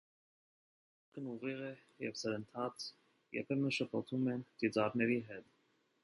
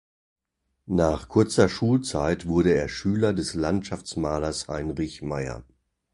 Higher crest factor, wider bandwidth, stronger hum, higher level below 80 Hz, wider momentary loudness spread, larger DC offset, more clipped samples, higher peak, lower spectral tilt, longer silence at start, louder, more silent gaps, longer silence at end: about the same, 20 dB vs 20 dB; about the same, 11.5 kHz vs 11.5 kHz; neither; second, -80 dBFS vs -42 dBFS; first, 13 LU vs 10 LU; neither; neither; second, -20 dBFS vs -6 dBFS; about the same, -5.5 dB/octave vs -6 dB/octave; first, 1.15 s vs 0.9 s; second, -39 LUFS vs -25 LUFS; neither; about the same, 0.6 s vs 0.5 s